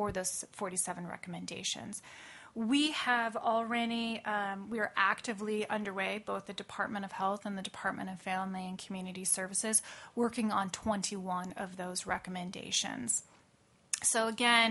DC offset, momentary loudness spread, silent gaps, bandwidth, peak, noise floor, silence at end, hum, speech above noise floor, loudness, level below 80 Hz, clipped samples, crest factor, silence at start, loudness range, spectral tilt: under 0.1%; 12 LU; none; 11.5 kHz; -12 dBFS; -67 dBFS; 0 s; none; 32 dB; -34 LUFS; -68 dBFS; under 0.1%; 24 dB; 0 s; 4 LU; -2.5 dB/octave